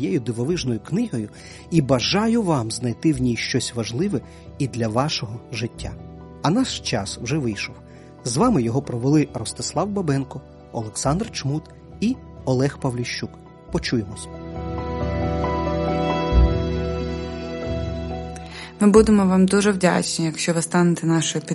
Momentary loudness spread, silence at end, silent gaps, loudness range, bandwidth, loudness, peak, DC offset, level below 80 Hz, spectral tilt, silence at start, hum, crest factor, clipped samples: 14 LU; 0 s; none; 7 LU; 11.5 kHz; -22 LUFS; -2 dBFS; under 0.1%; -34 dBFS; -5.5 dB/octave; 0 s; none; 20 dB; under 0.1%